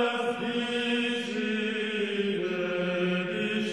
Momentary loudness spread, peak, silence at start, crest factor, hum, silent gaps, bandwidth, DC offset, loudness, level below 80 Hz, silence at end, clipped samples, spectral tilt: 2 LU; -16 dBFS; 0 s; 14 dB; none; none; 11.5 kHz; under 0.1%; -29 LUFS; -74 dBFS; 0 s; under 0.1%; -5 dB/octave